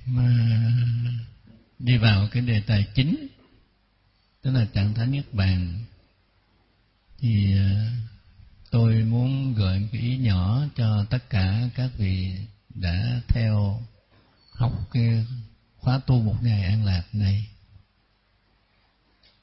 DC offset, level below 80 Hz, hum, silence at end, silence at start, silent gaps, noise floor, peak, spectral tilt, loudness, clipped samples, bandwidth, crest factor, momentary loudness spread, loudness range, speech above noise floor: under 0.1%; -42 dBFS; none; 1.9 s; 0 s; none; -65 dBFS; -6 dBFS; -11.5 dB/octave; -24 LUFS; under 0.1%; 5.8 kHz; 18 dB; 11 LU; 4 LU; 43 dB